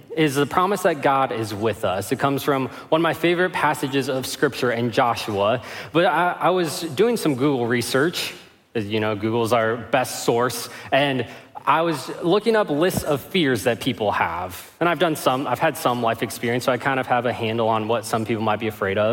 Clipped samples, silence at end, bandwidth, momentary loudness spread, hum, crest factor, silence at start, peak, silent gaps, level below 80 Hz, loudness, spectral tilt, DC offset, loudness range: under 0.1%; 0 s; 17 kHz; 5 LU; none; 18 dB; 0.1 s; -4 dBFS; none; -58 dBFS; -22 LUFS; -5 dB/octave; under 0.1%; 1 LU